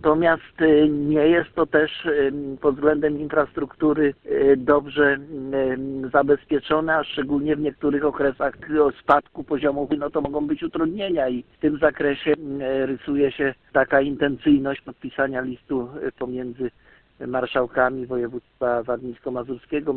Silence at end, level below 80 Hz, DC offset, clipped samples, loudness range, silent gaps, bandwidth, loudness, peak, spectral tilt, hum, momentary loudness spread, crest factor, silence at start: 0 s; -50 dBFS; under 0.1%; under 0.1%; 5 LU; none; 4.3 kHz; -22 LUFS; -4 dBFS; -9 dB/octave; none; 10 LU; 18 dB; 0 s